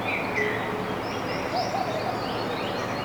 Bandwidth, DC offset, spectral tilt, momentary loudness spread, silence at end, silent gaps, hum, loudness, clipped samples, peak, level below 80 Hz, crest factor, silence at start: over 20 kHz; under 0.1%; -5 dB/octave; 4 LU; 0 s; none; none; -28 LUFS; under 0.1%; -14 dBFS; -52 dBFS; 14 dB; 0 s